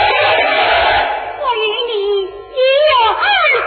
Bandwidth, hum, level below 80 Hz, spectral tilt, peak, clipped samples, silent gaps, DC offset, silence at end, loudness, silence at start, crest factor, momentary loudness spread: 4.7 kHz; none; -42 dBFS; -8 dB/octave; -2 dBFS; under 0.1%; none; under 0.1%; 0 s; -13 LUFS; 0 s; 12 dB; 8 LU